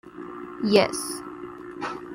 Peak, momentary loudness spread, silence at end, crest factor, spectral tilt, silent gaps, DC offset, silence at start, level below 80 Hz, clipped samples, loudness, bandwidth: -4 dBFS; 18 LU; 0 s; 22 dB; -4 dB/octave; none; under 0.1%; 0.05 s; -62 dBFS; under 0.1%; -25 LUFS; 16.5 kHz